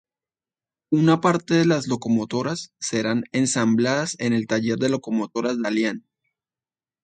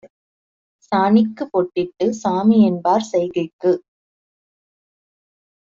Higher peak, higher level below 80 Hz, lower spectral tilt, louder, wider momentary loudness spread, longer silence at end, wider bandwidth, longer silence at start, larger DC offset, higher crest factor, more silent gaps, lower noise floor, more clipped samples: about the same, -4 dBFS vs -4 dBFS; about the same, -64 dBFS vs -62 dBFS; second, -5 dB/octave vs -6.5 dB/octave; second, -22 LUFS vs -18 LUFS; about the same, 7 LU vs 8 LU; second, 1.05 s vs 1.85 s; first, 9.4 kHz vs 7.6 kHz; first, 0.9 s vs 0.05 s; neither; about the same, 20 dB vs 16 dB; second, none vs 0.10-0.79 s, 3.53-3.59 s; about the same, under -90 dBFS vs under -90 dBFS; neither